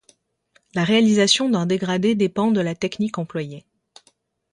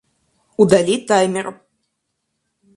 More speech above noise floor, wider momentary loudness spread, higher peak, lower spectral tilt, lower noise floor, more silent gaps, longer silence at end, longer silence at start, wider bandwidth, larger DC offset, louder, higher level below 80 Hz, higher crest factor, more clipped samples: second, 43 dB vs 59 dB; second, 13 LU vs 16 LU; second, -4 dBFS vs 0 dBFS; about the same, -4.5 dB/octave vs -5 dB/octave; second, -63 dBFS vs -74 dBFS; neither; second, 0.95 s vs 1.25 s; first, 0.75 s vs 0.6 s; about the same, 11 kHz vs 11.5 kHz; neither; second, -20 LUFS vs -16 LUFS; about the same, -62 dBFS vs -58 dBFS; about the same, 18 dB vs 20 dB; neither